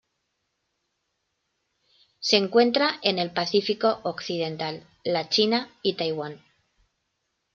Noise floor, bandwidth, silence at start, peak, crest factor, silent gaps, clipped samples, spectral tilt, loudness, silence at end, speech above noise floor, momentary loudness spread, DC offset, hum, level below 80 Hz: -77 dBFS; 7.6 kHz; 2.2 s; -4 dBFS; 24 dB; none; under 0.1%; -4 dB/octave; -24 LUFS; 1.2 s; 53 dB; 12 LU; under 0.1%; none; -72 dBFS